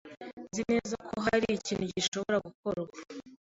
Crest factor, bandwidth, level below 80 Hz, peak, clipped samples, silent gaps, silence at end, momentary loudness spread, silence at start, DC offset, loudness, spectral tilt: 20 dB; 8 kHz; -62 dBFS; -12 dBFS; under 0.1%; 0.33-0.37 s, 2.08-2.12 s, 2.55-2.63 s; 0.05 s; 17 LU; 0.05 s; under 0.1%; -32 LUFS; -4 dB/octave